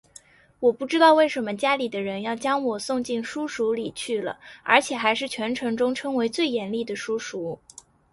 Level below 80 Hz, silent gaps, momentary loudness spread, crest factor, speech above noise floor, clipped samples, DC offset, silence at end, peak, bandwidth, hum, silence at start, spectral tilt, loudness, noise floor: -66 dBFS; none; 10 LU; 22 dB; 28 dB; under 0.1%; under 0.1%; 0.6 s; -2 dBFS; 11.5 kHz; none; 0.6 s; -3.5 dB/octave; -24 LUFS; -52 dBFS